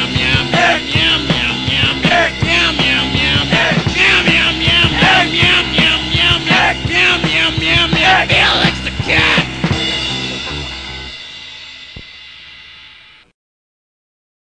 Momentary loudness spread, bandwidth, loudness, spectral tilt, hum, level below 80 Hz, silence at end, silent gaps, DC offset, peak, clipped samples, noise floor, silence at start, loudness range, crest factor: 16 LU; 10 kHz; -11 LUFS; -4 dB/octave; none; -30 dBFS; 1.7 s; none; under 0.1%; 0 dBFS; under 0.1%; -41 dBFS; 0 s; 13 LU; 14 dB